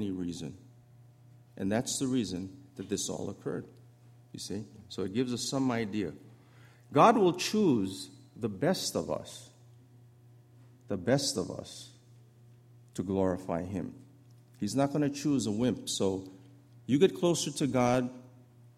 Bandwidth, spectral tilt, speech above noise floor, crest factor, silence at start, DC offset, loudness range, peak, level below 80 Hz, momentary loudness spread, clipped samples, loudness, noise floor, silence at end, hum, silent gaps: 15.5 kHz; -5 dB/octave; 27 dB; 24 dB; 0 s; under 0.1%; 8 LU; -8 dBFS; -66 dBFS; 17 LU; under 0.1%; -31 LUFS; -58 dBFS; 0.5 s; none; none